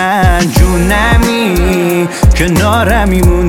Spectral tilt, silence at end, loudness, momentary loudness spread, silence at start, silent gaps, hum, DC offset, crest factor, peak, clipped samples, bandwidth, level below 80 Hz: -5.5 dB/octave; 0 s; -10 LUFS; 2 LU; 0 s; none; none; under 0.1%; 8 dB; 0 dBFS; 0.6%; 17.5 kHz; -14 dBFS